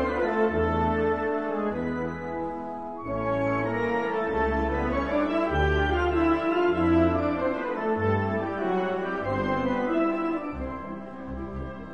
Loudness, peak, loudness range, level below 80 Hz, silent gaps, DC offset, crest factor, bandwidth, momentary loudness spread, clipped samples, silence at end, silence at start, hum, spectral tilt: -27 LUFS; -12 dBFS; 4 LU; -40 dBFS; none; 0.3%; 14 dB; 7 kHz; 11 LU; under 0.1%; 0 s; 0 s; none; -8 dB/octave